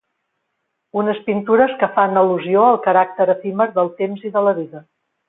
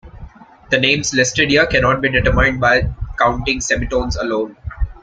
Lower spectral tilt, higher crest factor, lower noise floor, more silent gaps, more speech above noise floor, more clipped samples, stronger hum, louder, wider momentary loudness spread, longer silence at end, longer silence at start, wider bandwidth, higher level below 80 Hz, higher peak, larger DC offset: first, -11 dB/octave vs -4 dB/octave; about the same, 16 dB vs 16 dB; first, -74 dBFS vs -38 dBFS; neither; first, 57 dB vs 22 dB; neither; neither; about the same, -17 LUFS vs -15 LUFS; about the same, 8 LU vs 9 LU; first, 0.5 s vs 0.05 s; first, 0.95 s vs 0.05 s; second, 4 kHz vs 9.4 kHz; second, -66 dBFS vs -28 dBFS; about the same, -2 dBFS vs 0 dBFS; neither